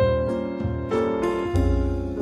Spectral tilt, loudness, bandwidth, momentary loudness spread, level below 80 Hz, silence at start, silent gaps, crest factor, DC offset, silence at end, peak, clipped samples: -8 dB/octave; -24 LUFS; 12 kHz; 5 LU; -30 dBFS; 0 s; none; 14 dB; under 0.1%; 0 s; -10 dBFS; under 0.1%